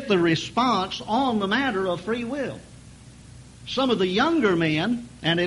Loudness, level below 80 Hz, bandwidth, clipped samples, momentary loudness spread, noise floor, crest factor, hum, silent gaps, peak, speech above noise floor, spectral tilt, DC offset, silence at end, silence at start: -23 LUFS; -52 dBFS; 11.5 kHz; under 0.1%; 9 LU; -46 dBFS; 18 dB; none; none; -6 dBFS; 23 dB; -5.5 dB/octave; under 0.1%; 0 s; 0 s